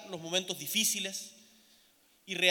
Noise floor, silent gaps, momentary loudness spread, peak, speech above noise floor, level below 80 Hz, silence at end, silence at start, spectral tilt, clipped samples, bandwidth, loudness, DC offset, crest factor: -66 dBFS; none; 12 LU; -10 dBFS; 32 dB; -88 dBFS; 0 s; 0 s; -1 dB/octave; under 0.1%; 19 kHz; -31 LUFS; under 0.1%; 26 dB